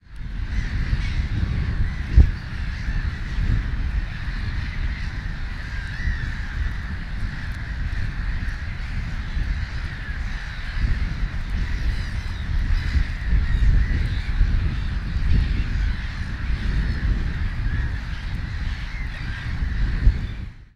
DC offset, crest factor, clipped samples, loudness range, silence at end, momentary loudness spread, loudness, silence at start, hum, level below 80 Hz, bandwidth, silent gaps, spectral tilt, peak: under 0.1%; 22 dB; under 0.1%; 5 LU; 0.1 s; 8 LU; -27 LUFS; 0.1 s; none; -24 dBFS; 7.4 kHz; none; -6.5 dB/octave; 0 dBFS